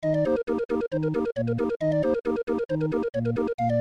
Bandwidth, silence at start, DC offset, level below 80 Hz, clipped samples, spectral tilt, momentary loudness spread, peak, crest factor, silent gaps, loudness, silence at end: 8.8 kHz; 0 s; under 0.1%; -52 dBFS; under 0.1%; -9 dB/octave; 3 LU; -14 dBFS; 12 dB; 0.65-0.69 s, 1.76-1.80 s, 2.43-2.47 s, 3.54-3.58 s; -26 LUFS; 0 s